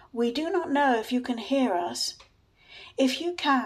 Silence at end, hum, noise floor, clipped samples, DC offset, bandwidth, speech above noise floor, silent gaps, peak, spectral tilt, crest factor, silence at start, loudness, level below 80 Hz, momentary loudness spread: 0 s; none; -54 dBFS; under 0.1%; under 0.1%; 14.5 kHz; 28 dB; none; -12 dBFS; -2.5 dB/octave; 16 dB; 0.15 s; -27 LUFS; -66 dBFS; 7 LU